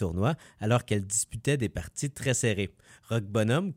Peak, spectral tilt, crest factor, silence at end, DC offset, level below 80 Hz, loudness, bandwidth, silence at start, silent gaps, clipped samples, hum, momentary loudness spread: -12 dBFS; -5 dB/octave; 16 dB; 0 s; under 0.1%; -52 dBFS; -29 LUFS; 16 kHz; 0 s; none; under 0.1%; none; 7 LU